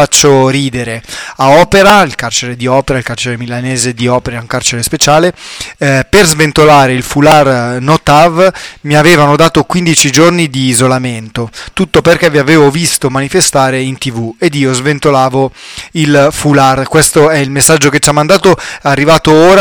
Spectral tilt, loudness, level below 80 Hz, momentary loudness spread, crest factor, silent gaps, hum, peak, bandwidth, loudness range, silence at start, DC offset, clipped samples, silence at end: -4 dB/octave; -8 LUFS; -34 dBFS; 11 LU; 8 dB; none; none; 0 dBFS; over 20 kHz; 4 LU; 0 s; under 0.1%; 0.2%; 0 s